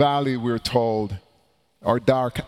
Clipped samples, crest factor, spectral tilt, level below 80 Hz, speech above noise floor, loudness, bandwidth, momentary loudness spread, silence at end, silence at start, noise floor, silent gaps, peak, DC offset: under 0.1%; 18 dB; -6.5 dB/octave; -50 dBFS; 42 dB; -23 LUFS; 16 kHz; 10 LU; 0 s; 0 s; -64 dBFS; none; -4 dBFS; under 0.1%